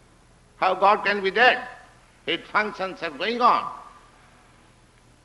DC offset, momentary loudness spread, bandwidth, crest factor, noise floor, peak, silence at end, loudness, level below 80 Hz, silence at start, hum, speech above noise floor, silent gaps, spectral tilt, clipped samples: under 0.1%; 16 LU; 11.5 kHz; 20 dB; -55 dBFS; -4 dBFS; 1.4 s; -22 LUFS; -60 dBFS; 0.6 s; none; 33 dB; none; -4 dB/octave; under 0.1%